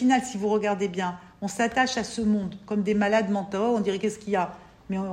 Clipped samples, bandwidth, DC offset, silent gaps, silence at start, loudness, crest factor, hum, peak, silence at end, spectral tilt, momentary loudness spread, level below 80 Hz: under 0.1%; 12 kHz; under 0.1%; none; 0 s; -26 LUFS; 16 dB; none; -10 dBFS; 0 s; -5 dB/octave; 9 LU; -58 dBFS